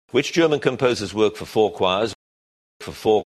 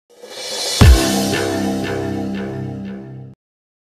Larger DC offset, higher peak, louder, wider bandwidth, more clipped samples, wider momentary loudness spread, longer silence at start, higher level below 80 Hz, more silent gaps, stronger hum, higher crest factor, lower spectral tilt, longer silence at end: neither; second, -4 dBFS vs 0 dBFS; second, -21 LUFS vs -17 LUFS; second, 13 kHz vs 15.5 kHz; neither; second, 8 LU vs 21 LU; about the same, 0.15 s vs 0.25 s; second, -56 dBFS vs -22 dBFS; first, 2.15-2.80 s vs none; neither; about the same, 18 dB vs 18 dB; about the same, -5 dB/octave vs -5 dB/octave; second, 0.1 s vs 0.6 s